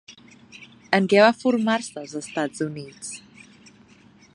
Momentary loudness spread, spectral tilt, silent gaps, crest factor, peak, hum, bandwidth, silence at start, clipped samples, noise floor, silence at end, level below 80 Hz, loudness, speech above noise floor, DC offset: 19 LU; -4.5 dB/octave; none; 24 dB; 0 dBFS; none; 11 kHz; 0.1 s; under 0.1%; -53 dBFS; 1.15 s; -70 dBFS; -22 LUFS; 31 dB; under 0.1%